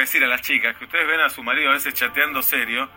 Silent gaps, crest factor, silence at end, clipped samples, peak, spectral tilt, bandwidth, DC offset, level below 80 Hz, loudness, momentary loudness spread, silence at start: none; 18 dB; 0.05 s; under 0.1%; -2 dBFS; -0.5 dB/octave; 16.5 kHz; under 0.1%; -60 dBFS; -19 LUFS; 3 LU; 0 s